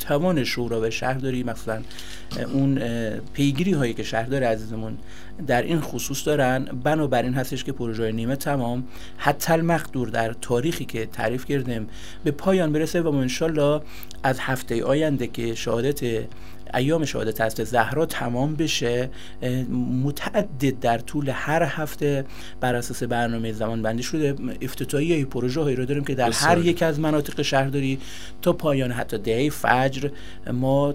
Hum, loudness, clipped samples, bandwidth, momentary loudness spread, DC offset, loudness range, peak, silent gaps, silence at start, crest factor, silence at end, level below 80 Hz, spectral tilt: none; -24 LUFS; under 0.1%; 16 kHz; 9 LU; 2%; 3 LU; -2 dBFS; none; 0 s; 22 dB; 0 s; -46 dBFS; -5.5 dB/octave